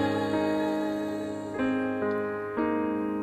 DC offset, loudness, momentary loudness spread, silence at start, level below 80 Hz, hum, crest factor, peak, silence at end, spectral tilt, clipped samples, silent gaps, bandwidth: under 0.1%; -29 LUFS; 5 LU; 0 s; -62 dBFS; none; 14 dB; -14 dBFS; 0 s; -6.5 dB/octave; under 0.1%; none; 13 kHz